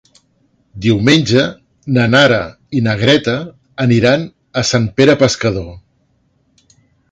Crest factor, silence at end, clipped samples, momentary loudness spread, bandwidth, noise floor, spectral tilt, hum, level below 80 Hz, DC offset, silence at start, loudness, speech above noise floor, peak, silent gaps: 14 dB; 1.35 s; under 0.1%; 12 LU; 9.2 kHz; -59 dBFS; -5.5 dB/octave; none; -42 dBFS; under 0.1%; 0.75 s; -13 LUFS; 46 dB; 0 dBFS; none